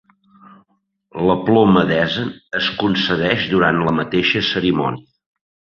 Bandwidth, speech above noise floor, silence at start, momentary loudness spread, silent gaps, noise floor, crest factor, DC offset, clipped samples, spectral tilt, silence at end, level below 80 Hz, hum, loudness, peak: 6.8 kHz; 47 dB; 1.15 s; 10 LU; none; -64 dBFS; 18 dB; under 0.1%; under 0.1%; -7 dB/octave; 0.8 s; -48 dBFS; none; -17 LUFS; -2 dBFS